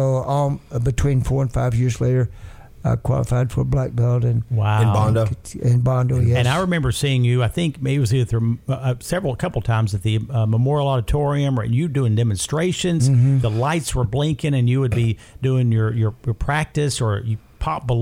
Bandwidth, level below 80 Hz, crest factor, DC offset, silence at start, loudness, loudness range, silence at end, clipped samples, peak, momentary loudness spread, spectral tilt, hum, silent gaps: 15 kHz; -36 dBFS; 12 dB; under 0.1%; 0 s; -20 LUFS; 2 LU; 0 s; under 0.1%; -6 dBFS; 6 LU; -6.5 dB/octave; none; none